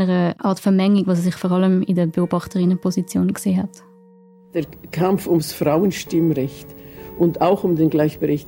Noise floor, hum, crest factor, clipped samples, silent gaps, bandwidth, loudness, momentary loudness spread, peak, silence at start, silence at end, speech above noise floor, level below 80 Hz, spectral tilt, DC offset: -48 dBFS; none; 14 dB; under 0.1%; none; 16.5 kHz; -19 LUFS; 11 LU; -4 dBFS; 0 s; 0 s; 30 dB; -52 dBFS; -7 dB/octave; under 0.1%